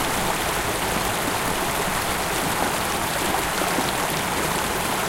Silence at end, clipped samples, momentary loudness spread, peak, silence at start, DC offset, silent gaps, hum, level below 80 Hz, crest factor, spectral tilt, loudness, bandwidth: 0 s; under 0.1%; 1 LU; -6 dBFS; 0 s; under 0.1%; none; none; -40 dBFS; 18 dB; -2.5 dB/octave; -23 LUFS; 17 kHz